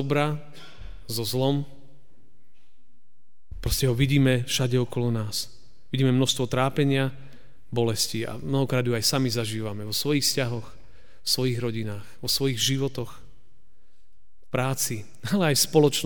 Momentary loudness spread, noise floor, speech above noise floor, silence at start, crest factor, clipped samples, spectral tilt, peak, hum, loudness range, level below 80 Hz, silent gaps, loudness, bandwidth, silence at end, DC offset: 12 LU; -72 dBFS; 47 dB; 0 s; 20 dB; under 0.1%; -4.5 dB/octave; -6 dBFS; none; 5 LU; -46 dBFS; none; -25 LUFS; over 20 kHz; 0 s; 2%